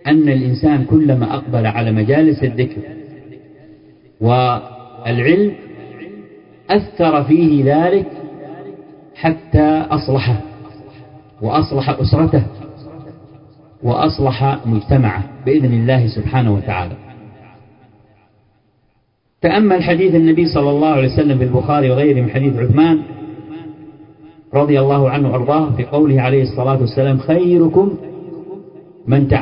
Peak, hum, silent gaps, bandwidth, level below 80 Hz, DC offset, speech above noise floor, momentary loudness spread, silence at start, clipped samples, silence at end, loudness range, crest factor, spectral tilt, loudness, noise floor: 0 dBFS; none; none; 5.4 kHz; -36 dBFS; under 0.1%; 48 dB; 20 LU; 0.05 s; under 0.1%; 0 s; 5 LU; 16 dB; -12 dB/octave; -14 LUFS; -61 dBFS